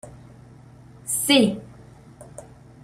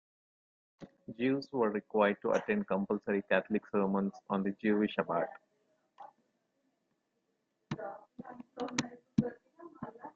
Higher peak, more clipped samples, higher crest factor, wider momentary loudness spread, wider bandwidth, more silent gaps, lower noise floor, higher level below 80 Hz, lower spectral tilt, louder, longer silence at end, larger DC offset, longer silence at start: first, -4 dBFS vs -14 dBFS; neither; about the same, 22 dB vs 22 dB; first, 26 LU vs 18 LU; first, 16 kHz vs 7.8 kHz; neither; second, -47 dBFS vs -81 dBFS; first, -58 dBFS vs -72 dBFS; second, -3 dB/octave vs -6 dB/octave; first, -20 LUFS vs -34 LUFS; first, 0.45 s vs 0.05 s; neither; second, 0.05 s vs 0.8 s